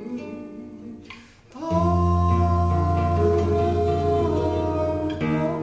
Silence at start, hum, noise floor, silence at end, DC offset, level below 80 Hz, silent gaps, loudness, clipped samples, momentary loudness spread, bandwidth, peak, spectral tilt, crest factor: 0 s; none; -45 dBFS; 0 s; under 0.1%; -30 dBFS; none; -22 LUFS; under 0.1%; 18 LU; 7.6 kHz; -10 dBFS; -9 dB/octave; 14 dB